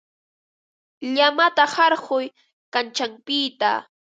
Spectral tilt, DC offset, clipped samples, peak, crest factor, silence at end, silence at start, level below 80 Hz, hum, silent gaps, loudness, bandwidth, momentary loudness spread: -1.5 dB/octave; under 0.1%; under 0.1%; -2 dBFS; 20 dB; 0.35 s; 1 s; -80 dBFS; none; 2.53-2.72 s; -21 LUFS; 9.2 kHz; 10 LU